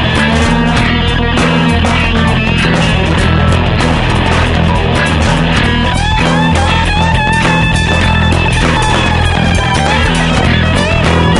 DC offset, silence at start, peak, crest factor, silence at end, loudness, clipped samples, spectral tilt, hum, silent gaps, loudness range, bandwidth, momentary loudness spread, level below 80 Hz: under 0.1%; 0 s; 0 dBFS; 10 dB; 0 s; -10 LUFS; under 0.1%; -5.5 dB/octave; none; none; 0 LU; 11.5 kHz; 1 LU; -18 dBFS